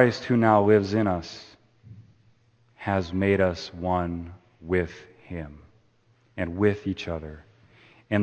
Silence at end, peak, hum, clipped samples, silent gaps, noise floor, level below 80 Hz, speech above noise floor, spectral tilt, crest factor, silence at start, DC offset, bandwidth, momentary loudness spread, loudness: 0 s; -4 dBFS; none; under 0.1%; none; -63 dBFS; -52 dBFS; 39 dB; -7.5 dB/octave; 24 dB; 0 s; under 0.1%; 8.4 kHz; 23 LU; -25 LUFS